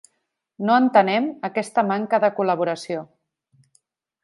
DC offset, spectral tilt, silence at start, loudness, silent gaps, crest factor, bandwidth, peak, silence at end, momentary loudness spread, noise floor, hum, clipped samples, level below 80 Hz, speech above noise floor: under 0.1%; -6 dB/octave; 0.6 s; -21 LUFS; none; 20 dB; 11.5 kHz; -2 dBFS; 1.2 s; 12 LU; -75 dBFS; none; under 0.1%; -76 dBFS; 55 dB